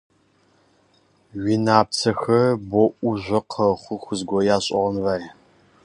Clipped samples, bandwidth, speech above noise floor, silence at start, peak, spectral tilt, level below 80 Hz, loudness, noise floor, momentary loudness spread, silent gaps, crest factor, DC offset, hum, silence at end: under 0.1%; 11 kHz; 40 dB; 1.35 s; -2 dBFS; -5.5 dB/octave; -54 dBFS; -21 LUFS; -61 dBFS; 11 LU; none; 22 dB; under 0.1%; none; 0.55 s